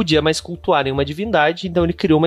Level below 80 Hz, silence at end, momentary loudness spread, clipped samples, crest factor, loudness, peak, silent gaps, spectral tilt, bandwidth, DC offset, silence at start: -38 dBFS; 0 s; 5 LU; under 0.1%; 14 dB; -18 LUFS; -4 dBFS; none; -5.5 dB/octave; 13 kHz; under 0.1%; 0 s